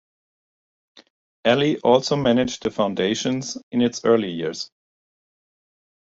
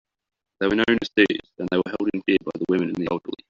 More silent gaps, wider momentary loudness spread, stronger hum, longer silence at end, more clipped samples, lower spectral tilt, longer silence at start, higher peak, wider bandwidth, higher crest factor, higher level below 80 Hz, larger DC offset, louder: first, 3.63-3.71 s vs none; first, 10 LU vs 7 LU; neither; first, 1.35 s vs 0.15 s; neither; first, -5 dB/octave vs -3.5 dB/octave; first, 1.45 s vs 0.6 s; about the same, -4 dBFS vs -4 dBFS; first, 8 kHz vs 7.2 kHz; about the same, 20 dB vs 20 dB; about the same, -58 dBFS vs -56 dBFS; neither; about the same, -21 LUFS vs -23 LUFS